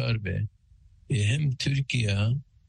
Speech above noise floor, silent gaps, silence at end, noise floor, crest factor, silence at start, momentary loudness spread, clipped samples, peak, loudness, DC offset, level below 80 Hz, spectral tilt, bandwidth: 31 dB; none; 0.25 s; -57 dBFS; 12 dB; 0 s; 7 LU; under 0.1%; -14 dBFS; -28 LUFS; under 0.1%; -50 dBFS; -5.5 dB/octave; 10 kHz